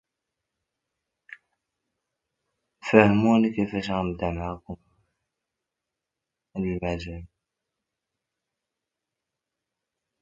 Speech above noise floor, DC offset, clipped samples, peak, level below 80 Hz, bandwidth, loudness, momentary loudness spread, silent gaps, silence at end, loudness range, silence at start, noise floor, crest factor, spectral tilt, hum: 63 dB; under 0.1%; under 0.1%; 0 dBFS; -50 dBFS; 7.6 kHz; -24 LUFS; 21 LU; none; 2.95 s; 12 LU; 2.85 s; -86 dBFS; 28 dB; -7.5 dB/octave; none